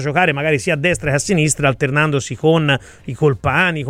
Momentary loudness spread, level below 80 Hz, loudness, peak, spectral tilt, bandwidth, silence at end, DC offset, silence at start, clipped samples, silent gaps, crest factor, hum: 3 LU; -42 dBFS; -16 LUFS; -2 dBFS; -5 dB/octave; 15 kHz; 0 s; under 0.1%; 0 s; under 0.1%; none; 14 dB; none